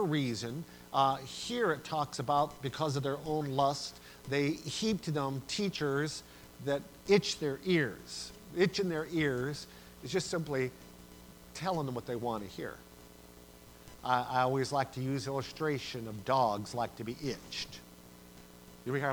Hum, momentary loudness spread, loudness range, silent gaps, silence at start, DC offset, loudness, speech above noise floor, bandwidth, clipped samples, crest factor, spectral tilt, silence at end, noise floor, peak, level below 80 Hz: 60 Hz at -55 dBFS; 23 LU; 5 LU; none; 0 s; under 0.1%; -34 LUFS; 21 dB; over 20 kHz; under 0.1%; 22 dB; -5 dB/octave; 0 s; -55 dBFS; -12 dBFS; -62 dBFS